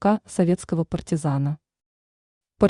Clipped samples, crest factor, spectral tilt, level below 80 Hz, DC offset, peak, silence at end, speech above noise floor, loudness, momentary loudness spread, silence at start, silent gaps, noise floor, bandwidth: under 0.1%; 18 dB; -7.5 dB/octave; -50 dBFS; under 0.1%; -6 dBFS; 0 s; over 67 dB; -24 LUFS; 5 LU; 0 s; 1.86-2.41 s; under -90 dBFS; 11 kHz